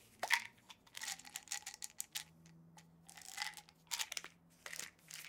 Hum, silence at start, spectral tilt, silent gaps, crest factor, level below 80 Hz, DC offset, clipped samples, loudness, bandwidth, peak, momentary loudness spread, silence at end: none; 0 s; 1 dB/octave; none; 34 dB; -84 dBFS; under 0.1%; under 0.1%; -43 LUFS; 18 kHz; -14 dBFS; 24 LU; 0 s